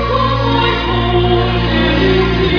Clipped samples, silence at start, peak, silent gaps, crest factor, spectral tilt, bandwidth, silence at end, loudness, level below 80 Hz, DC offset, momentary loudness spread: under 0.1%; 0 s; 0 dBFS; none; 12 dB; -7.5 dB/octave; 5.4 kHz; 0 s; -13 LUFS; -22 dBFS; under 0.1%; 2 LU